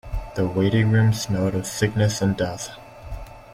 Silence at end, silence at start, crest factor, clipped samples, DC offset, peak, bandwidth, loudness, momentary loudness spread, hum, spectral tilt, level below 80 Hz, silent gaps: 0 s; 0.05 s; 16 dB; under 0.1%; under 0.1%; -6 dBFS; 16 kHz; -22 LUFS; 20 LU; none; -6 dB/octave; -38 dBFS; none